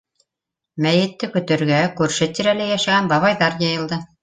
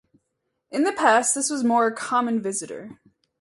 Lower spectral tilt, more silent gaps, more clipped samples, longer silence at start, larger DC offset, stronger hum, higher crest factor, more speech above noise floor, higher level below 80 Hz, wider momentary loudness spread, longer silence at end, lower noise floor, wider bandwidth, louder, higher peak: first, -5 dB/octave vs -2.5 dB/octave; neither; neither; about the same, 0.75 s vs 0.7 s; neither; neither; about the same, 16 dB vs 20 dB; first, 66 dB vs 55 dB; first, -58 dBFS vs -72 dBFS; second, 7 LU vs 13 LU; second, 0.15 s vs 0.45 s; first, -84 dBFS vs -77 dBFS; second, 9.6 kHz vs 11.5 kHz; first, -18 LUFS vs -22 LUFS; about the same, -2 dBFS vs -4 dBFS